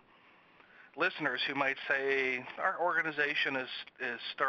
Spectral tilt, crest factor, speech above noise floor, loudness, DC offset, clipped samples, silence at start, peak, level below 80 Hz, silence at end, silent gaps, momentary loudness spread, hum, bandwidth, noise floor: -4.5 dB/octave; 20 dB; 29 dB; -32 LUFS; under 0.1%; under 0.1%; 0.8 s; -14 dBFS; -82 dBFS; 0 s; none; 8 LU; none; 7 kHz; -62 dBFS